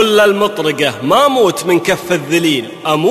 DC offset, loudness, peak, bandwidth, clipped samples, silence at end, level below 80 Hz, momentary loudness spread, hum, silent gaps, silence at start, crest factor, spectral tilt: under 0.1%; -13 LUFS; 0 dBFS; 15 kHz; under 0.1%; 0 s; -54 dBFS; 6 LU; none; none; 0 s; 12 dB; -4 dB/octave